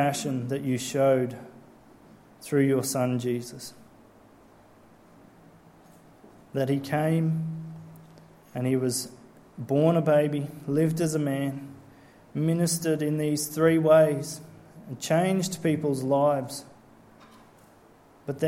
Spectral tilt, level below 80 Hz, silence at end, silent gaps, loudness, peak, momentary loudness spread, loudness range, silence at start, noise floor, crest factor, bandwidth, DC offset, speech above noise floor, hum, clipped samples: -6 dB/octave; -66 dBFS; 0 s; none; -26 LUFS; -8 dBFS; 18 LU; 7 LU; 0 s; -55 dBFS; 20 dB; 16.5 kHz; under 0.1%; 30 dB; none; under 0.1%